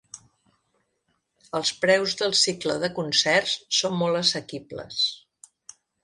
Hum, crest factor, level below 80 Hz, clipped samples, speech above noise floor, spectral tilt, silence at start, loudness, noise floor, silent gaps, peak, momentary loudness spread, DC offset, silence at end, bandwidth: none; 20 dB; -66 dBFS; under 0.1%; 49 dB; -2.5 dB/octave; 0.15 s; -23 LUFS; -74 dBFS; none; -6 dBFS; 12 LU; under 0.1%; 0.85 s; 11.5 kHz